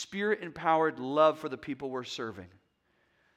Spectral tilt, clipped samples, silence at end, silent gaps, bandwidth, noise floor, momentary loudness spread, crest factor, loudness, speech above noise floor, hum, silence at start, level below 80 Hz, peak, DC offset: -5 dB/octave; under 0.1%; 0.9 s; none; 10 kHz; -73 dBFS; 12 LU; 20 dB; -30 LUFS; 42 dB; none; 0 s; -74 dBFS; -10 dBFS; under 0.1%